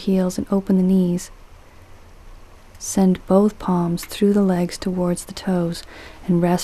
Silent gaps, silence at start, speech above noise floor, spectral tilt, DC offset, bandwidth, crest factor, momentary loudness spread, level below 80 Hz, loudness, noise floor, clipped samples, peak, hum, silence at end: none; 0 s; 24 dB; -6.5 dB/octave; under 0.1%; 14 kHz; 18 dB; 10 LU; -44 dBFS; -20 LUFS; -43 dBFS; under 0.1%; -2 dBFS; none; 0 s